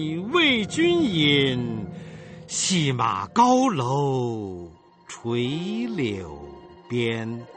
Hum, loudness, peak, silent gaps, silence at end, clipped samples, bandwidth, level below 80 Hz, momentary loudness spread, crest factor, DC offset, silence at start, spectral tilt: none; -23 LUFS; -6 dBFS; none; 0 s; under 0.1%; 8.8 kHz; -56 dBFS; 20 LU; 18 dB; under 0.1%; 0 s; -4.5 dB/octave